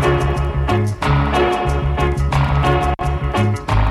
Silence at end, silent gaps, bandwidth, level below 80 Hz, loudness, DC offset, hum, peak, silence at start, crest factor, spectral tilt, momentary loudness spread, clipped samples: 0 s; none; 12.5 kHz; -22 dBFS; -18 LUFS; under 0.1%; none; -4 dBFS; 0 s; 12 dB; -7 dB/octave; 3 LU; under 0.1%